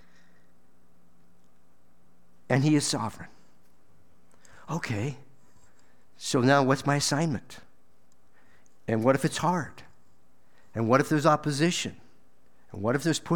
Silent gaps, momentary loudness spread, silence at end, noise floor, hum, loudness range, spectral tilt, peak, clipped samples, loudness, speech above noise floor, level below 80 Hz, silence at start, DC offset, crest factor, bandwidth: none; 19 LU; 0 s; -67 dBFS; none; 4 LU; -5 dB/octave; -6 dBFS; under 0.1%; -26 LUFS; 41 dB; -66 dBFS; 2.5 s; 0.5%; 22 dB; 18 kHz